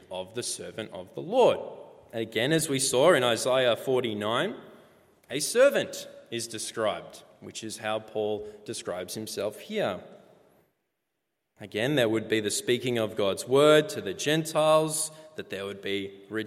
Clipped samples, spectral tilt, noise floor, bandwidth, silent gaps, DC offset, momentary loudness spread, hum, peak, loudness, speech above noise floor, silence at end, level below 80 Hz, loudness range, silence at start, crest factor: under 0.1%; -3.5 dB/octave; -82 dBFS; 16 kHz; none; under 0.1%; 16 LU; none; -8 dBFS; -27 LUFS; 55 dB; 0 s; -72 dBFS; 9 LU; 0.1 s; 20 dB